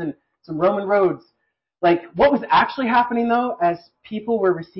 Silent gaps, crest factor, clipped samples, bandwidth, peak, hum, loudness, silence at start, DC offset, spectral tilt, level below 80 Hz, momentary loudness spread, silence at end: none; 14 dB; under 0.1%; 5.8 kHz; -6 dBFS; none; -19 LUFS; 0 s; under 0.1%; -10.5 dB/octave; -54 dBFS; 14 LU; 0 s